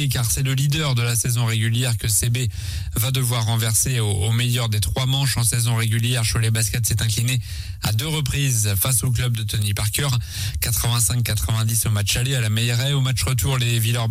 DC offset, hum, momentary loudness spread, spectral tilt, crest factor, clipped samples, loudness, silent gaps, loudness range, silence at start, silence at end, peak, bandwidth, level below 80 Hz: under 0.1%; none; 4 LU; -3.5 dB/octave; 14 dB; under 0.1%; -20 LUFS; none; 1 LU; 0 s; 0 s; -6 dBFS; 16.5 kHz; -36 dBFS